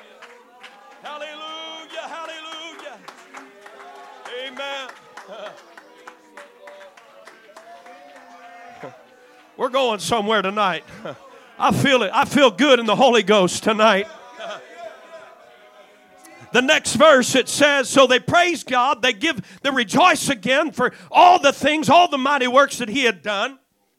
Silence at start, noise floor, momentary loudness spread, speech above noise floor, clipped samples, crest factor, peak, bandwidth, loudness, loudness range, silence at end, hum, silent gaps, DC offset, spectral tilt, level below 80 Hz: 0.2 s; -50 dBFS; 22 LU; 33 dB; under 0.1%; 20 dB; 0 dBFS; 16 kHz; -17 LUFS; 19 LU; 0.45 s; none; none; under 0.1%; -3 dB/octave; -62 dBFS